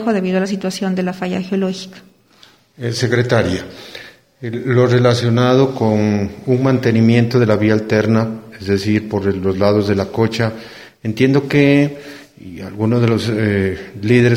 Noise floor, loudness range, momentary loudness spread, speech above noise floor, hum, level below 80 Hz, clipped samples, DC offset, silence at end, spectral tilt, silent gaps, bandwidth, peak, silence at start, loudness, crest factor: -49 dBFS; 6 LU; 17 LU; 34 dB; none; -50 dBFS; under 0.1%; under 0.1%; 0 s; -7 dB/octave; none; 14 kHz; 0 dBFS; 0 s; -16 LUFS; 16 dB